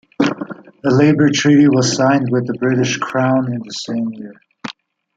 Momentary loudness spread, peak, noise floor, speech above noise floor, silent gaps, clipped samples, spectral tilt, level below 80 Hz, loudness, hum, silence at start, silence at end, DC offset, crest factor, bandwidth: 20 LU; -2 dBFS; -38 dBFS; 23 dB; none; under 0.1%; -5.5 dB/octave; -56 dBFS; -15 LUFS; none; 0.2 s; 0.45 s; under 0.1%; 14 dB; 7.8 kHz